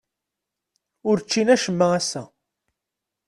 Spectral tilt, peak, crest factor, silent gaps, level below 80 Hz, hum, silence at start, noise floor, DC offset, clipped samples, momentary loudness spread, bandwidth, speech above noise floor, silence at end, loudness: -4.5 dB/octave; -4 dBFS; 20 dB; none; -66 dBFS; none; 1.05 s; -84 dBFS; under 0.1%; under 0.1%; 11 LU; 12.5 kHz; 64 dB; 1 s; -21 LUFS